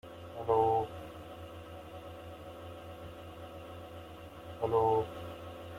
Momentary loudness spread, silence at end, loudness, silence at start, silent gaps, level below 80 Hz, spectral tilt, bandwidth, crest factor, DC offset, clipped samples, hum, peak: 19 LU; 0 s; -32 LUFS; 0.05 s; none; -62 dBFS; -7 dB/octave; 16 kHz; 20 dB; under 0.1%; under 0.1%; none; -16 dBFS